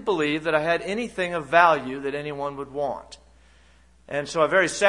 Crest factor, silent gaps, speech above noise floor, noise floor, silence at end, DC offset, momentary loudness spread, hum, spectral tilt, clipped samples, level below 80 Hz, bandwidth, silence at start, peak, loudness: 22 dB; none; 33 dB; -56 dBFS; 0 s; under 0.1%; 13 LU; none; -4 dB/octave; under 0.1%; -56 dBFS; 11 kHz; 0 s; -2 dBFS; -24 LUFS